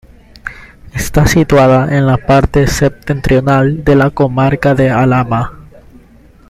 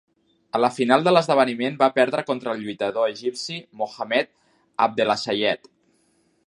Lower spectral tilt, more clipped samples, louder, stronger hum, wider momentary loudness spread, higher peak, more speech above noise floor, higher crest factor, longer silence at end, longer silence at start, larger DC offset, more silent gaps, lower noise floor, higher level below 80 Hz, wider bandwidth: first, -6.5 dB/octave vs -4.5 dB/octave; neither; first, -11 LUFS vs -22 LUFS; neither; about the same, 15 LU vs 13 LU; about the same, 0 dBFS vs -2 dBFS; second, 32 dB vs 43 dB; second, 12 dB vs 22 dB; about the same, 0.9 s vs 0.9 s; about the same, 0.45 s vs 0.55 s; neither; neither; second, -41 dBFS vs -65 dBFS; first, -26 dBFS vs -72 dBFS; first, 15 kHz vs 11.5 kHz